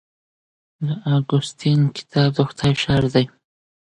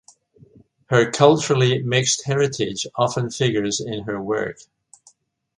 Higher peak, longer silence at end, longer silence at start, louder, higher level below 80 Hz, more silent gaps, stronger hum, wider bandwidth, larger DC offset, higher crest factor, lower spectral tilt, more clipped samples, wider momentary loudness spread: about the same, -4 dBFS vs -2 dBFS; second, 0.7 s vs 1.05 s; about the same, 0.8 s vs 0.9 s; about the same, -20 LUFS vs -20 LUFS; first, -48 dBFS vs -58 dBFS; neither; neither; second, 9.6 kHz vs 11 kHz; neither; about the same, 16 dB vs 20 dB; first, -6.5 dB/octave vs -4.5 dB/octave; neither; about the same, 8 LU vs 10 LU